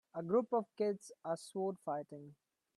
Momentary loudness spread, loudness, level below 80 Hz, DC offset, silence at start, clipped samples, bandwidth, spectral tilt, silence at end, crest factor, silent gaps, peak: 16 LU; -39 LUFS; -88 dBFS; under 0.1%; 0.15 s; under 0.1%; 12.5 kHz; -6.5 dB/octave; 0.45 s; 18 dB; none; -22 dBFS